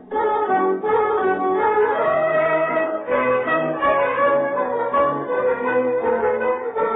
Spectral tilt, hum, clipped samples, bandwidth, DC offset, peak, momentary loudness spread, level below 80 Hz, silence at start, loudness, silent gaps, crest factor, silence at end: -9.5 dB/octave; none; under 0.1%; 4 kHz; under 0.1%; -8 dBFS; 3 LU; -56 dBFS; 0 s; -20 LUFS; none; 12 dB; 0 s